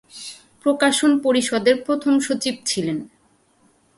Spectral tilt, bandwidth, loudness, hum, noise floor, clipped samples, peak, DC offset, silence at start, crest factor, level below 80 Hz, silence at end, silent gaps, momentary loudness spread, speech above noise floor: -3.5 dB/octave; 11.5 kHz; -20 LUFS; none; -60 dBFS; under 0.1%; -4 dBFS; under 0.1%; 0.15 s; 18 dB; -64 dBFS; 0.9 s; none; 14 LU; 41 dB